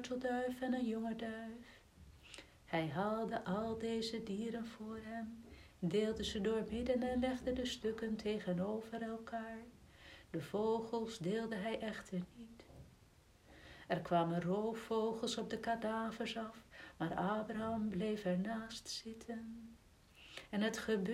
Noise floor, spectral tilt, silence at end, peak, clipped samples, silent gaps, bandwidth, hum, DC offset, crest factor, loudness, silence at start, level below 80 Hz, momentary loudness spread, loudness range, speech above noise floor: -66 dBFS; -5.5 dB/octave; 0 s; -22 dBFS; under 0.1%; none; 15.5 kHz; none; under 0.1%; 20 dB; -41 LUFS; 0 s; -64 dBFS; 18 LU; 3 LU; 26 dB